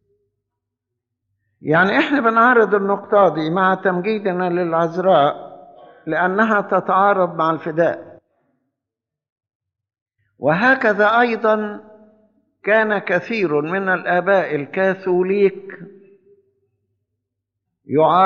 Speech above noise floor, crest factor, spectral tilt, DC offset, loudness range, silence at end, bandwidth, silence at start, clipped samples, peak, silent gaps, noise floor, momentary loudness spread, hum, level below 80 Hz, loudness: 68 dB; 16 dB; -4 dB/octave; under 0.1%; 6 LU; 0 s; 7 kHz; 1.65 s; under 0.1%; -2 dBFS; 9.32-9.36 s, 9.55-9.60 s, 10.02-10.06 s; -85 dBFS; 8 LU; none; -72 dBFS; -17 LUFS